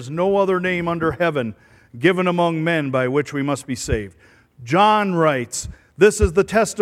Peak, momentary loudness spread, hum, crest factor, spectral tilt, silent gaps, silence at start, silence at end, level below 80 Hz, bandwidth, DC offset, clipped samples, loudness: -2 dBFS; 10 LU; none; 18 dB; -5 dB/octave; none; 0 s; 0 s; -38 dBFS; 15 kHz; under 0.1%; under 0.1%; -19 LUFS